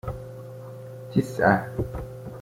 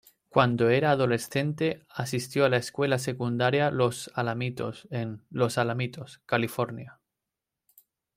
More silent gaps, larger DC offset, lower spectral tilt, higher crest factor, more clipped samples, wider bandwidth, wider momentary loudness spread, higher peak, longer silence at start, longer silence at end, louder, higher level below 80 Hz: neither; neither; first, -7.5 dB/octave vs -5.5 dB/octave; about the same, 22 dB vs 22 dB; neither; about the same, 16.5 kHz vs 16 kHz; first, 19 LU vs 11 LU; about the same, -6 dBFS vs -6 dBFS; second, 0.05 s vs 0.35 s; second, 0 s vs 1.25 s; about the same, -25 LUFS vs -27 LUFS; first, -44 dBFS vs -66 dBFS